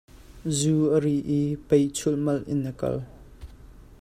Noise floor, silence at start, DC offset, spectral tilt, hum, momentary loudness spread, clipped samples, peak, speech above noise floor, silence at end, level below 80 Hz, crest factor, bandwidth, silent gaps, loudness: -47 dBFS; 0.15 s; under 0.1%; -6.5 dB/octave; none; 9 LU; under 0.1%; -8 dBFS; 23 dB; 0.2 s; -50 dBFS; 18 dB; 14 kHz; none; -25 LUFS